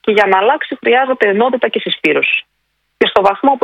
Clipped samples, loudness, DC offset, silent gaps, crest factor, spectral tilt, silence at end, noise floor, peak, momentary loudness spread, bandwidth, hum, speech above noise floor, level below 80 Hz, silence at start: 0.2%; -13 LUFS; under 0.1%; none; 14 dB; -5.5 dB/octave; 0.05 s; -66 dBFS; 0 dBFS; 5 LU; 8.6 kHz; 50 Hz at -50 dBFS; 53 dB; -56 dBFS; 0.05 s